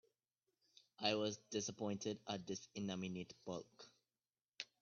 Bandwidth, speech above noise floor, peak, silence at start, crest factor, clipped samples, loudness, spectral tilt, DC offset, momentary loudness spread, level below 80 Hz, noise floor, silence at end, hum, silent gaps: 7.2 kHz; over 45 dB; -22 dBFS; 1 s; 26 dB; under 0.1%; -45 LUFS; -3.5 dB/octave; under 0.1%; 13 LU; -84 dBFS; under -90 dBFS; 0.15 s; none; none